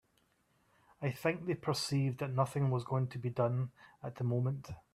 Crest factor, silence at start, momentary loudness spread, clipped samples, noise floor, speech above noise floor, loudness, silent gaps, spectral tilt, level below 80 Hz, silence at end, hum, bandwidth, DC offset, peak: 18 dB; 1 s; 8 LU; under 0.1%; -74 dBFS; 39 dB; -36 LUFS; none; -6.5 dB/octave; -70 dBFS; 0.15 s; none; 14 kHz; under 0.1%; -18 dBFS